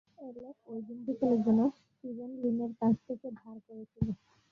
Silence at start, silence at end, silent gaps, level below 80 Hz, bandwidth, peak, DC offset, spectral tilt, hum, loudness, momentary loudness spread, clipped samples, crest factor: 0.2 s; 0.35 s; none; -58 dBFS; 4.8 kHz; -16 dBFS; under 0.1%; -10.5 dB/octave; none; -32 LUFS; 21 LU; under 0.1%; 16 dB